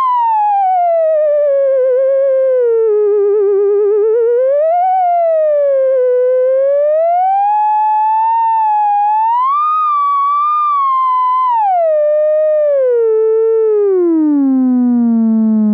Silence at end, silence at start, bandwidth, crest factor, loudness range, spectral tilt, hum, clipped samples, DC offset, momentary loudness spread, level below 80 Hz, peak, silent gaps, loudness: 0 s; 0 s; 4.3 kHz; 4 dB; 0 LU; -10 dB/octave; none; under 0.1%; under 0.1%; 0 LU; -76 dBFS; -8 dBFS; none; -12 LUFS